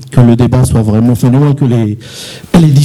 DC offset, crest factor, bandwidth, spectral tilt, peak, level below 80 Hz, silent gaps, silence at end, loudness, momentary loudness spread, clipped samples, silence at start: under 0.1%; 8 dB; 13.5 kHz; -7.5 dB/octave; 0 dBFS; -30 dBFS; none; 0 s; -9 LUFS; 13 LU; 1%; 0 s